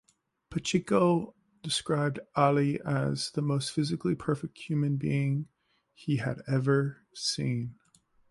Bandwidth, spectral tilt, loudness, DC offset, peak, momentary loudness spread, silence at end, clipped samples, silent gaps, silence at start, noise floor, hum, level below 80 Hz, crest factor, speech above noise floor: 11.5 kHz; -6 dB/octave; -30 LUFS; under 0.1%; -10 dBFS; 10 LU; 0.55 s; under 0.1%; none; 0.5 s; -55 dBFS; none; -62 dBFS; 20 dB; 26 dB